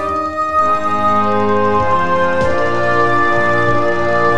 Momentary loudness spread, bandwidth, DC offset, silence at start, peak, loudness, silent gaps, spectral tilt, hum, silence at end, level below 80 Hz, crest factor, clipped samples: 2 LU; 12 kHz; 10%; 0 s; -2 dBFS; -14 LUFS; none; -6.5 dB/octave; none; 0 s; -40 dBFS; 12 dB; under 0.1%